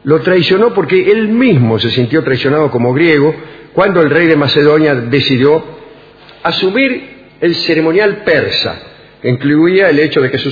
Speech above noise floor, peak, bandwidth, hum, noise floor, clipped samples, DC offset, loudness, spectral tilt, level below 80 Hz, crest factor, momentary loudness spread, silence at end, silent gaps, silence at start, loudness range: 28 dB; 0 dBFS; 5 kHz; none; -38 dBFS; 0.1%; under 0.1%; -11 LUFS; -7.5 dB/octave; -48 dBFS; 10 dB; 8 LU; 0 s; none; 0.05 s; 3 LU